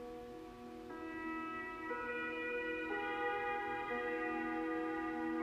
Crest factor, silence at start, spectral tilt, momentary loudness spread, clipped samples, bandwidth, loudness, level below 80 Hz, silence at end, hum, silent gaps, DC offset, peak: 14 dB; 0 s; -5.5 dB/octave; 11 LU; under 0.1%; 15 kHz; -41 LUFS; -68 dBFS; 0 s; none; none; under 0.1%; -28 dBFS